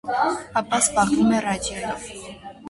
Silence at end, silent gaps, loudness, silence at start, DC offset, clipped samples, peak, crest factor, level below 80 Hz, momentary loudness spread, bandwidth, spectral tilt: 0 s; none; -22 LUFS; 0.05 s; under 0.1%; under 0.1%; -6 dBFS; 18 dB; -48 dBFS; 17 LU; 12 kHz; -3.5 dB/octave